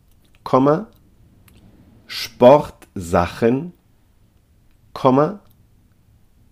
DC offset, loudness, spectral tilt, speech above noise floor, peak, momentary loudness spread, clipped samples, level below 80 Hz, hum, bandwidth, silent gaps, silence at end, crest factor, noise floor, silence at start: under 0.1%; -17 LUFS; -7 dB/octave; 40 dB; 0 dBFS; 25 LU; under 0.1%; -50 dBFS; none; 15.5 kHz; none; 1.15 s; 20 dB; -55 dBFS; 0.45 s